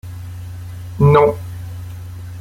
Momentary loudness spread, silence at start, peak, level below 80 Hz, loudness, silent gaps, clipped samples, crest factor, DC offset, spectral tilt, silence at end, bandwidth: 20 LU; 0.05 s; -2 dBFS; -42 dBFS; -14 LUFS; none; under 0.1%; 16 dB; under 0.1%; -8.5 dB/octave; 0 s; 15.5 kHz